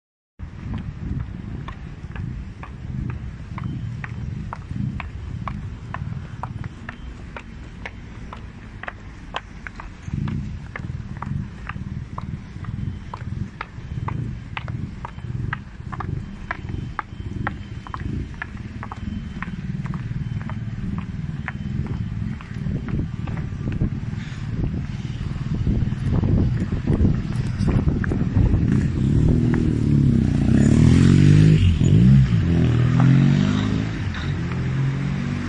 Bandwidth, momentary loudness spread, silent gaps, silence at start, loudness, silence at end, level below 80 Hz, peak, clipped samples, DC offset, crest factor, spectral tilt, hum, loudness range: 9.8 kHz; 18 LU; none; 0.4 s; -23 LUFS; 0 s; -32 dBFS; -2 dBFS; under 0.1%; under 0.1%; 20 dB; -8 dB/octave; none; 17 LU